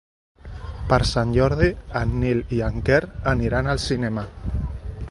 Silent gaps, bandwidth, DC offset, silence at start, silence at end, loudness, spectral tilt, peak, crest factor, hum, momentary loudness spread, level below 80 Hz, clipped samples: none; 11.5 kHz; under 0.1%; 0.45 s; 0 s; -22 LUFS; -6.5 dB/octave; -2 dBFS; 20 dB; none; 13 LU; -32 dBFS; under 0.1%